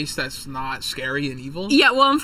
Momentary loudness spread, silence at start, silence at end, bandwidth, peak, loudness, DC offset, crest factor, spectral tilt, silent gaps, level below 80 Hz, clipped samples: 14 LU; 0 s; 0 s; 16.5 kHz; -2 dBFS; -20 LUFS; under 0.1%; 18 dB; -3.5 dB/octave; none; -46 dBFS; under 0.1%